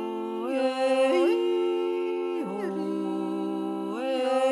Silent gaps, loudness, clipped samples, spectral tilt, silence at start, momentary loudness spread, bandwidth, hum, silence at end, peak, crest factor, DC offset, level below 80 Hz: none; -27 LUFS; under 0.1%; -5.5 dB/octave; 0 s; 8 LU; 12 kHz; none; 0 s; -14 dBFS; 14 dB; under 0.1%; -88 dBFS